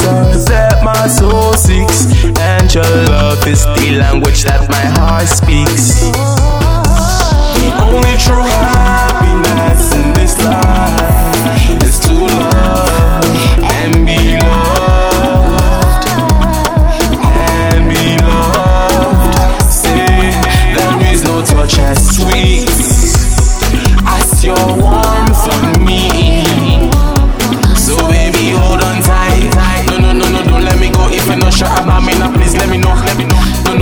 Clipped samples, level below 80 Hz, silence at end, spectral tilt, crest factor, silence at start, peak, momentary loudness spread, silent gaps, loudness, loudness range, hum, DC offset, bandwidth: under 0.1%; -12 dBFS; 0 s; -4.5 dB/octave; 8 dB; 0 s; 0 dBFS; 2 LU; none; -9 LUFS; 1 LU; none; under 0.1%; over 20 kHz